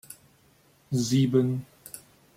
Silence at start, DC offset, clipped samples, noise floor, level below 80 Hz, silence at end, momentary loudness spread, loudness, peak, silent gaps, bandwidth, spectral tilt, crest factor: 0.1 s; under 0.1%; under 0.1%; -61 dBFS; -64 dBFS; 0.4 s; 23 LU; -26 LUFS; -12 dBFS; none; 16 kHz; -6.5 dB/octave; 18 dB